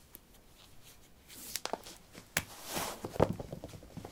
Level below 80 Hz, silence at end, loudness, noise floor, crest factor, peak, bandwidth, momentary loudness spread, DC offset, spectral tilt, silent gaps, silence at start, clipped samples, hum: -58 dBFS; 0 s; -38 LUFS; -59 dBFS; 32 dB; -8 dBFS; 17.5 kHz; 24 LU; under 0.1%; -4 dB/octave; none; 0 s; under 0.1%; none